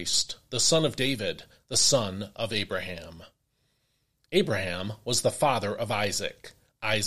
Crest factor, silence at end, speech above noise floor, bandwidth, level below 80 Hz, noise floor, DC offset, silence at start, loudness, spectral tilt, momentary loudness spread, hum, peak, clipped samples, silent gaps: 20 dB; 0 s; 46 dB; 15.5 kHz; -58 dBFS; -74 dBFS; 0.5%; 0 s; -27 LUFS; -2.5 dB/octave; 12 LU; none; -8 dBFS; under 0.1%; none